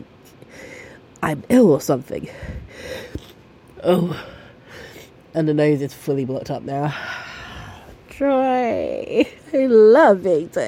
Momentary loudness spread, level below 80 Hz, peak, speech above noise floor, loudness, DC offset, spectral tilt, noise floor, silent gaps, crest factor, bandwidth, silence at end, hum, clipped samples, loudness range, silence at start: 24 LU; -48 dBFS; -4 dBFS; 29 dB; -18 LUFS; under 0.1%; -6.5 dB/octave; -46 dBFS; none; 16 dB; 16.5 kHz; 0 s; none; under 0.1%; 8 LU; 0.55 s